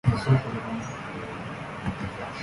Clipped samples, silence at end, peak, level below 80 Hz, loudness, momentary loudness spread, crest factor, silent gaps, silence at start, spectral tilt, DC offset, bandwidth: under 0.1%; 0 s; -8 dBFS; -46 dBFS; -30 LUFS; 12 LU; 20 dB; none; 0.05 s; -7 dB/octave; under 0.1%; 11.5 kHz